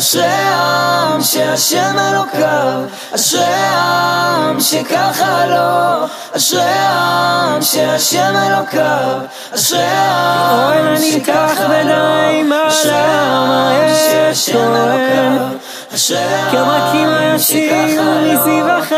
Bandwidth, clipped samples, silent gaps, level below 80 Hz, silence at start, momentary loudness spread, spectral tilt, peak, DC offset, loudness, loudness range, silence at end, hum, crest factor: 15.5 kHz; under 0.1%; none; -62 dBFS; 0 s; 3 LU; -3 dB/octave; 0 dBFS; under 0.1%; -12 LUFS; 1 LU; 0 s; none; 12 dB